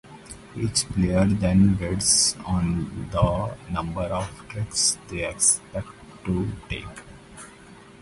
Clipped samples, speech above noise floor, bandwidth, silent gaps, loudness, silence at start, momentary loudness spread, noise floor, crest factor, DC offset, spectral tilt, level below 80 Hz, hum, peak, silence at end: under 0.1%; 23 dB; 11.5 kHz; none; -23 LUFS; 0.05 s; 22 LU; -47 dBFS; 20 dB; under 0.1%; -4 dB/octave; -40 dBFS; none; -6 dBFS; 0.05 s